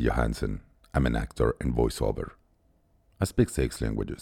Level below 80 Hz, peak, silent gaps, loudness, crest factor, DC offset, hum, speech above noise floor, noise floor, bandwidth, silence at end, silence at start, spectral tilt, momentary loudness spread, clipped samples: -36 dBFS; -10 dBFS; none; -29 LUFS; 18 dB; under 0.1%; none; 38 dB; -65 dBFS; 16.5 kHz; 0 s; 0 s; -6.5 dB/octave; 8 LU; under 0.1%